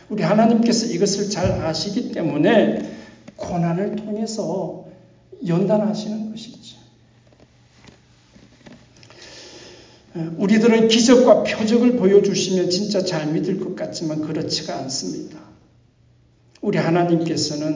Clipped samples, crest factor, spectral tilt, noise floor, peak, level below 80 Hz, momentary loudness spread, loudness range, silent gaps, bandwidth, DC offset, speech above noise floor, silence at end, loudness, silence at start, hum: under 0.1%; 20 dB; -5 dB/octave; -55 dBFS; -2 dBFS; -52 dBFS; 18 LU; 11 LU; none; 7.6 kHz; under 0.1%; 37 dB; 0 s; -19 LUFS; 0.1 s; none